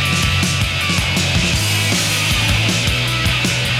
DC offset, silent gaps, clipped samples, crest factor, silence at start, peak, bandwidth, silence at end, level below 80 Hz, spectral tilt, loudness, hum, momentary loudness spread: under 0.1%; none; under 0.1%; 14 dB; 0 s; -2 dBFS; 16.5 kHz; 0 s; -30 dBFS; -3 dB/octave; -15 LUFS; none; 1 LU